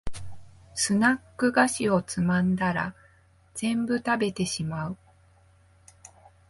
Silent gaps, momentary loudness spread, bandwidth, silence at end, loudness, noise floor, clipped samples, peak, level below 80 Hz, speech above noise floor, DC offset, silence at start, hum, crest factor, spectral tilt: none; 15 LU; 11.5 kHz; 0.4 s; -26 LUFS; -59 dBFS; under 0.1%; -8 dBFS; -52 dBFS; 34 dB; under 0.1%; 0.05 s; none; 20 dB; -4.5 dB/octave